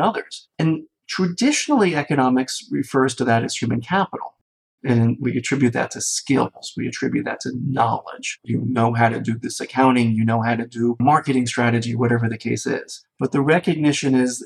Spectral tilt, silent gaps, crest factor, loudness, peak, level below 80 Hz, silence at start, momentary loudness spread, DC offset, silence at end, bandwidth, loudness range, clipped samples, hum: -5.5 dB/octave; 4.41-4.78 s; 16 dB; -20 LUFS; -4 dBFS; -62 dBFS; 0 s; 9 LU; under 0.1%; 0 s; 13 kHz; 3 LU; under 0.1%; none